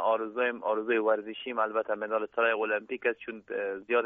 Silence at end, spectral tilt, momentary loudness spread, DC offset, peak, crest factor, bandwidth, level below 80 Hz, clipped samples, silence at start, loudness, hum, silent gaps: 0 s; -1 dB/octave; 7 LU; under 0.1%; -14 dBFS; 16 dB; 3.9 kHz; -76 dBFS; under 0.1%; 0 s; -30 LUFS; none; none